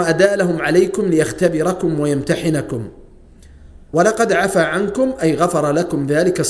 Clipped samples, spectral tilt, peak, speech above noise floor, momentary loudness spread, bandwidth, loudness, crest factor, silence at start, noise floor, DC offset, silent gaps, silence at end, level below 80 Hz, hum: under 0.1%; -5.5 dB/octave; 0 dBFS; 26 dB; 5 LU; 11 kHz; -17 LUFS; 16 dB; 0 s; -42 dBFS; under 0.1%; none; 0 s; -44 dBFS; none